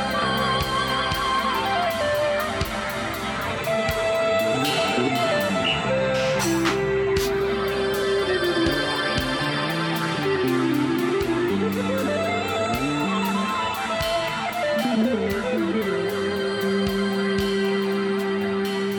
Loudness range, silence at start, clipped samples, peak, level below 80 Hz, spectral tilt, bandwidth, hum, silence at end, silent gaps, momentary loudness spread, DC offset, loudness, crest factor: 2 LU; 0 s; under 0.1%; -8 dBFS; -44 dBFS; -4.5 dB/octave; over 20 kHz; none; 0 s; none; 3 LU; under 0.1%; -23 LUFS; 14 dB